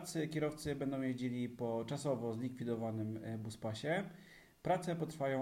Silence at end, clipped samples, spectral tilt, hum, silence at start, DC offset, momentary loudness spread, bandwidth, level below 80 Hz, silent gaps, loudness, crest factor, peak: 0 s; under 0.1%; -6 dB/octave; none; 0 s; under 0.1%; 6 LU; 16 kHz; -70 dBFS; none; -40 LUFS; 18 dB; -22 dBFS